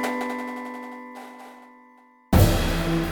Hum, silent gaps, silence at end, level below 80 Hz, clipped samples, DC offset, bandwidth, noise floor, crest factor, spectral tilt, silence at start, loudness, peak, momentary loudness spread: none; none; 0 s; -32 dBFS; under 0.1%; under 0.1%; over 20 kHz; -54 dBFS; 22 dB; -6 dB/octave; 0 s; -24 LUFS; -4 dBFS; 22 LU